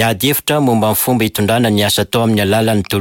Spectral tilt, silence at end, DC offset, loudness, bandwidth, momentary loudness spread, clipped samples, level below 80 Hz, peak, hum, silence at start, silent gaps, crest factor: -4.5 dB/octave; 0 s; under 0.1%; -13 LUFS; 17 kHz; 2 LU; under 0.1%; -44 dBFS; -4 dBFS; none; 0 s; none; 10 dB